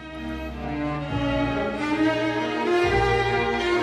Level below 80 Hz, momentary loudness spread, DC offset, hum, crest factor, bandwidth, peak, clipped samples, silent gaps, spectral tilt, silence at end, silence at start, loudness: -38 dBFS; 11 LU; under 0.1%; none; 14 dB; 13 kHz; -10 dBFS; under 0.1%; none; -6 dB/octave; 0 s; 0 s; -24 LUFS